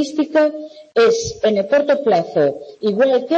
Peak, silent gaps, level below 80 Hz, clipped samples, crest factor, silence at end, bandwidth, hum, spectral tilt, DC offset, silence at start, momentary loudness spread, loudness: -6 dBFS; none; -54 dBFS; under 0.1%; 10 dB; 0 s; 8.6 kHz; none; -5 dB/octave; under 0.1%; 0 s; 7 LU; -17 LUFS